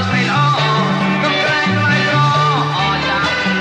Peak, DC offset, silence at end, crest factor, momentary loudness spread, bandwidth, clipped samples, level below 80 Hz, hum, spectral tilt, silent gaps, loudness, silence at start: -4 dBFS; under 0.1%; 0 s; 12 dB; 2 LU; 9.4 kHz; under 0.1%; -46 dBFS; none; -5.5 dB/octave; none; -14 LUFS; 0 s